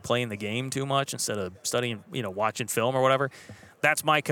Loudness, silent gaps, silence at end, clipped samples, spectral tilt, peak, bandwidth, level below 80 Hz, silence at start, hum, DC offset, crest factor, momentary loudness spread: -27 LUFS; none; 0 s; under 0.1%; -3.5 dB/octave; -6 dBFS; 19 kHz; -72 dBFS; 0.05 s; none; under 0.1%; 22 dB; 8 LU